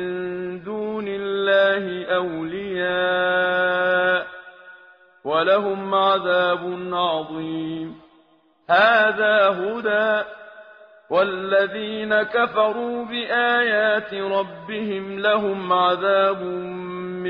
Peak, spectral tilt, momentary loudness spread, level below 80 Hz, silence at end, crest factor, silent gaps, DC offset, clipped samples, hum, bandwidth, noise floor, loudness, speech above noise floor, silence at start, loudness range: -6 dBFS; -1.5 dB/octave; 11 LU; -64 dBFS; 0 s; 16 dB; none; under 0.1%; under 0.1%; none; 5.2 kHz; -58 dBFS; -21 LUFS; 37 dB; 0 s; 2 LU